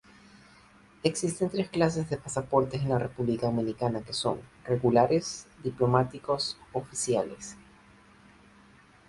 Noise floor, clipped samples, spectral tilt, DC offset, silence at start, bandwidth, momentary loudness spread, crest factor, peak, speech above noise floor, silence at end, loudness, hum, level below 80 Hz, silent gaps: -57 dBFS; under 0.1%; -5.5 dB/octave; under 0.1%; 1.05 s; 11.5 kHz; 11 LU; 22 dB; -8 dBFS; 29 dB; 1.55 s; -29 LUFS; none; -58 dBFS; none